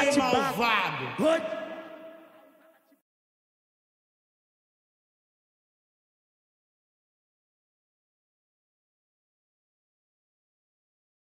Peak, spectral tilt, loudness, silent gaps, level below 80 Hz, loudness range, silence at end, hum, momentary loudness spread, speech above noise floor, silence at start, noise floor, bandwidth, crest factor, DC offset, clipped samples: -12 dBFS; -4 dB/octave; -26 LUFS; none; -70 dBFS; 20 LU; 9.05 s; none; 21 LU; 35 dB; 0 s; -61 dBFS; 16 kHz; 22 dB; under 0.1%; under 0.1%